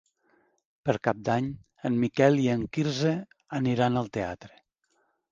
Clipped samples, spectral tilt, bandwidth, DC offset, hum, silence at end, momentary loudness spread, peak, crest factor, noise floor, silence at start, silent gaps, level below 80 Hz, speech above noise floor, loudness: under 0.1%; -7 dB/octave; 7.6 kHz; under 0.1%; none; 0.85 s; 13 LU; -6 dBFS; 22 dB; -73 dBFS; 0.85 s; none; -60 dBFS; 46 dB; -28 LUFS